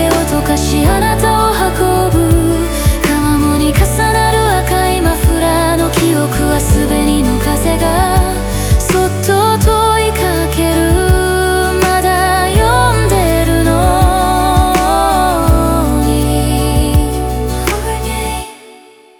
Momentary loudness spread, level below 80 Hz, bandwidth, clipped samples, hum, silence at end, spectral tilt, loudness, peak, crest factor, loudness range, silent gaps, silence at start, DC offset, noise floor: 3 LU; -18 dBFS; over 20 kHz; under 0.1%; none; 0.45 s; -5 dB/octave; -12 LUFS; 0 dBFS; 12 dB; 2 LU; none; 0 s; under 0.1%; -40 dBFS